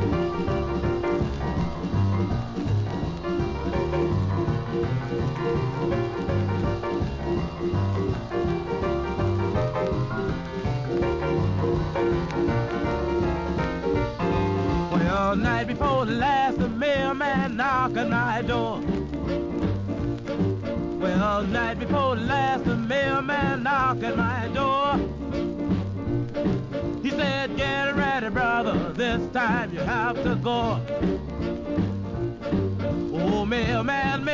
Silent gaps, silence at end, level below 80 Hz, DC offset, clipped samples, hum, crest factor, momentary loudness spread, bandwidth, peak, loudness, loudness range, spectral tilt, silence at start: none; 0 s; -38 dBFS; under 0.1%; under 0.1%; none; 12 dB; 5 LU; 7.6 kHz; -12 dBFS; -25 LUFS; 3 LU; -7.5 dB/octave; 0 s